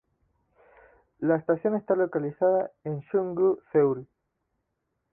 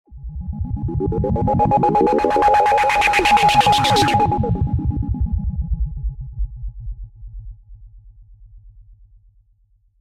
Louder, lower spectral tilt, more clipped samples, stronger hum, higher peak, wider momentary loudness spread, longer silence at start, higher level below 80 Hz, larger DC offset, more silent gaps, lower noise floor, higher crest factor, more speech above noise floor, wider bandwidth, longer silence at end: second, -26 LUFS vs -17 LUFS; first, -12.5 dB/octave vs -5.5 dB/octave; neither; neither; second, -12 dBFS vs -2 dBFS; second, 7 LU vs 20 LU; first, 1.2 s vs 0.1 s; second, -70 dBFS vs -28 dBFS; neither; neither; first, -79 dBFS vs -58 dBFS; about the same, 16 dB vs 16 dB; first, 54 dB vs 43 dB; second, 2.8 kHz vs 15.5 kHz; about the same, 1.1 s vs 1.2 s